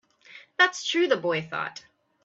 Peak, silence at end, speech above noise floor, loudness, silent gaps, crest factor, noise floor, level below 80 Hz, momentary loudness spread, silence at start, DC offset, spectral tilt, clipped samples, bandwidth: -6 dBFS; 0.45 s; 26 dB; -25 LUFS; none; 22 dB; -51 dBFS; -76 dBFS; 15 LU; 0.35 s; under 0.1%; -3 dB/octave; under 0.1%; 8 kHz